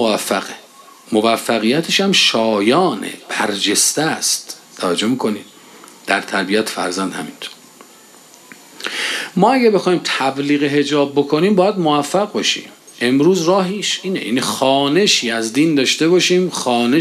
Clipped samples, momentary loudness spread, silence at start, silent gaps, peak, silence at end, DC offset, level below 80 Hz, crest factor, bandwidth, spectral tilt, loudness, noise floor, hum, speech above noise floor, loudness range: under 0.1%; 10 LU; 0 s; none; 0 dBFS; 0 s; under 0.1%; -68 dBFS; 16 dB; 14 kHz; -3.5 dB/octave; -16 LUFS; -44 dBFS; none; 28 dB; 6 LU